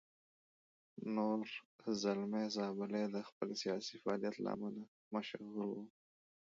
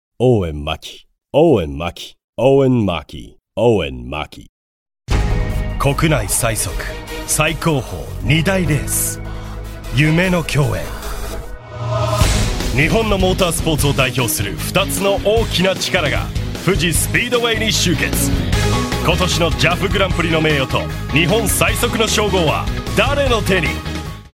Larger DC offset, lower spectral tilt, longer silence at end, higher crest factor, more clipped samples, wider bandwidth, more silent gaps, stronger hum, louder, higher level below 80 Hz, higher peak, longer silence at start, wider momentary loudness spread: neither; about the same, -4.5 dB/octave vs -4.5 dB/octave; first, 0.7 s vs 0.05 s; about the same, 18 dB vs 16 dB; neither; second, 7.4 kHz vs 16.5 kHz; about the same, 1.65-1.79 s, 3.32-3.41 s, 4.88-5.11 s vs 2.24-2.33 s, 4.49-4.86 s; neither; second, -42 LUFS vs -16 LUFS; second, -84 dBFS vs -26 dBFS; second, -26 dBFS vs 0 dBFS; first, 0.95 s vs 0.2 s; about the same, 10 LU vs 12 LU